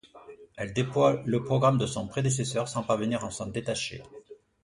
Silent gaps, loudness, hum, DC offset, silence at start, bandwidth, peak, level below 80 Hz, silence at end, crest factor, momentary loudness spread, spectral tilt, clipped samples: none; -28 LUFS; none; under 0.1%; 0.05 s; 11.5 kHz; -8 dBFS; -58 dBFS; 0.3 s; 20 dB; 12 LU; -5.5 dB/octave; under 0.1%